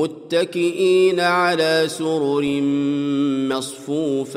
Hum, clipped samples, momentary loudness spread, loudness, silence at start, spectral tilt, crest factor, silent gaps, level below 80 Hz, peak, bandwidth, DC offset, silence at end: none; under 0.1%; 6 LU; -19 LUFS; 0 s; -5 dB/octave; 12 dB; none; -66 dBFS; -6 dBFS; 15 kHz; under 0.1%; 0 s